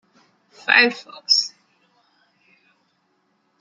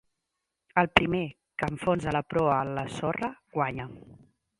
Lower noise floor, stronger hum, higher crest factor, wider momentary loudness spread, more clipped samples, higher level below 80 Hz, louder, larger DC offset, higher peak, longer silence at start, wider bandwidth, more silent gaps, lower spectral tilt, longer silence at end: second, -67 dBFS vs -84 dBFS; neither; about the same, 24 dB vs 28 dB; first, 17 LU vs 10 LU; neither; second, -88 dBFS vs -54 dBFS; first, -17 LUFS vs -28 LUFS; neither; about the same, 0 dBFS vs -2 dBFS; about the same, 0.65 s vs 0.75 s; about the same, 11.5 kHz vs 11.5 kHz; neither; second, 0 dB/octave vs -6 dB/octave; first, 2.1 s vs 0.45 s